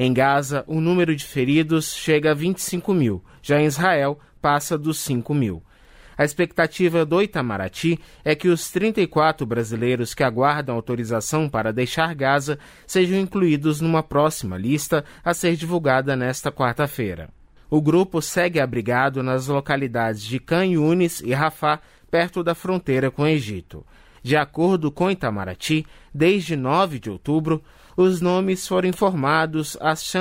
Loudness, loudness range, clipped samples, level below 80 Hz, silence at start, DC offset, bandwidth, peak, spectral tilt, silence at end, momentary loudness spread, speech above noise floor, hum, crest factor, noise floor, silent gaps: -21 LUFS; 2 LU; under 0.1%; -50 dBFS; 0 s; under 0.1%; 16 kHz; -6 dBFS; -5.5 dB/octave; 0 s; 6 LU; 27 dB; none; 16 dB; -48 dBFS; none